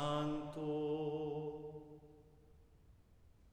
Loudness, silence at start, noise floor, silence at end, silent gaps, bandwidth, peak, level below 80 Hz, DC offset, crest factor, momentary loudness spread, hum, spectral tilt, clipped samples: -42 LUFS; 0 s; -65 dBFS; 0 s; none; 10.5 kHz; -26 dBFS; -66 dBFS; under 0.1%; 16 dB; 19 LU; none; -7 dB/octave; under 0.1%